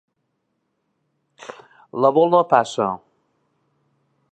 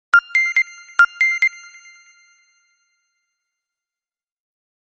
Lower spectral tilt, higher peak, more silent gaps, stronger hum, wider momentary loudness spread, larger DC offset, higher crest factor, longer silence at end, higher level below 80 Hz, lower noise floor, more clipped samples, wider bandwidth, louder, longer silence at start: first, -6 dB/octave vs 3.5 dB/octave; about the same, -2 dBFS vs -2 dBFS; neither; neither; first, 24 LU vs 6 LU; neither; about the same, 22 dB vs 20 dB; second, 1.35 s vs 3.35 s; first, -70 dBFS vs -82 dBFS; second, -73 dBFS vs under -90 dBFS; neither; about the same, 9 kHz vs 8.2 kHz; about the same, -18 LUFS vs -16 LUFS; first, 1.5 s vs 0.15 s